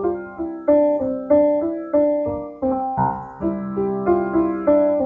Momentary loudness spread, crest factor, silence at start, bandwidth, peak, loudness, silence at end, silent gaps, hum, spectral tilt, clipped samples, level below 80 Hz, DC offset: 9 LU; 14 dB; 0 s; 3.5 kHz; -6 dBFS; -20 LUFS; 0 s; none; none; -12 dB/octave; under 0.1%; -48 dBFS; under 0.1%